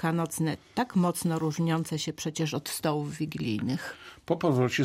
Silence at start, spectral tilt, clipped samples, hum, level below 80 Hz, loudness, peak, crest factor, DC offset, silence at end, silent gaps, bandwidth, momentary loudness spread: 0 s; -5.5 dB/octave; under 0.1%; none; -64 dBFS; -30 LUFS; -12 dBFS; 16 dB; under 0.1%; 0 s; none; 16 kHz; 6 LU